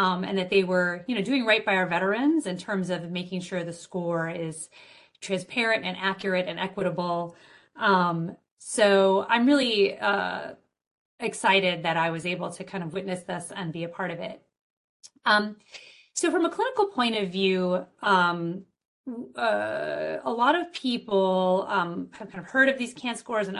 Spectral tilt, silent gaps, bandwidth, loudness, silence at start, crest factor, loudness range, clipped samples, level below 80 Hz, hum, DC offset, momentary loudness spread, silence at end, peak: -4.5 dB/octave; 8.51-8.57 s, 10.87-11.18 s, 14.61-15.00 s, 18.85-19.04 s; 11.5 kHz; -26 LUFS; 0 s; 20 dB; 6 LU; under 0.1%; -70 dBFS; none; under 0.1%; 13 LU; 0 s; -8 dBFS